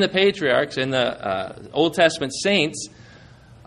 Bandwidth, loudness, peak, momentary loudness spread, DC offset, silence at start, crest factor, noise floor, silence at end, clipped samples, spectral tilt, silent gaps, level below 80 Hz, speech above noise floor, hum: 13 kHz; -21 LUFS; -4 dBFS; 10 LU; under 0.1%; 0 s; 18 dB; -47 dBFS; 0.15 s; under 0.1%; -4 dB/octave; none; -56 dBFS; 26 dB; none